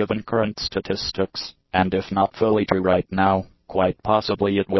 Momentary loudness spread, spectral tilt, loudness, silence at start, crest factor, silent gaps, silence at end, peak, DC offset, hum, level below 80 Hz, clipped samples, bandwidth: 6 LU; -6.5 dB/octave; -22 LUFS; 0 s; 22 dB; none; 0 s; 0 dBFS; under 0.1%; none; -44 dBFS; under 0.1%; 6.2 kHz